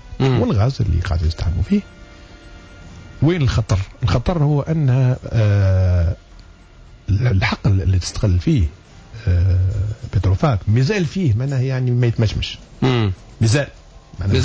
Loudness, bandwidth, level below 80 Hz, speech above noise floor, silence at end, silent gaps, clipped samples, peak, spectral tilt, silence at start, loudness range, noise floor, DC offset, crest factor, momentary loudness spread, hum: -18 LUFS; 8 kHz; -26 dBFS; 26 dB; 0 s; none; under 0.1%; -6 dBFS; -7 dB/octave; 0.05 s; 3 LU; -43 dBFS; under 0.1%; 12 dB; 6 LU; none